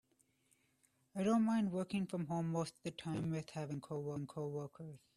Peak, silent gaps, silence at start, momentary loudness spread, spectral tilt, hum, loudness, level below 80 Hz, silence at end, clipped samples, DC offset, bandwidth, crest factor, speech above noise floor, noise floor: -24 dBFS; none; 1.15 s; 12 LU; -7 dB/octave; none; -40 LUFS; -76 dBFS; 0.2 s; under 0.1%; under 0.1%; 12.5 kHz; 16 dB; 38 dB; -77 dBFS